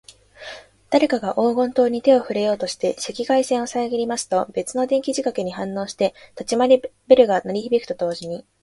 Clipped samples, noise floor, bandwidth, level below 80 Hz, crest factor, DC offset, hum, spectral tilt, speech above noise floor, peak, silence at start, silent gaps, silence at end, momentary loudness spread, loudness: under 0.1%; -40 dBFS; 11.5 kHz; -60 dBFS; 20 dB; under 0.1%; none; -4.5 dB/octave; 20 dB; 0 dBFS; 0.4 s; none; 0.2 s; 11 LU; -20 LUFS